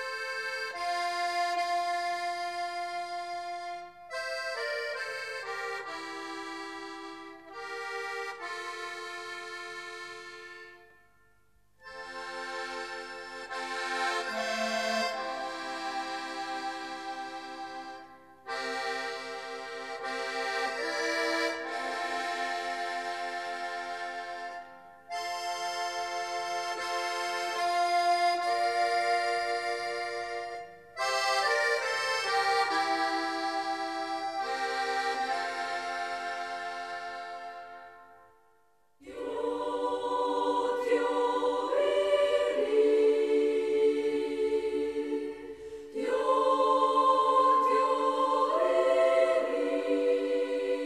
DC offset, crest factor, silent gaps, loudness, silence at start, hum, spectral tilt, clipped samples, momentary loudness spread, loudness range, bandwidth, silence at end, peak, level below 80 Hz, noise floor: under 0.1%; 18 dB; none; -31 LUFS; 0 s; none; -1.5 dB/octave; under 0.1%; 15 LU; 12 LU; 14 kHz; 0 s; -12 dBFS; -72 dBFS; -69 dBFS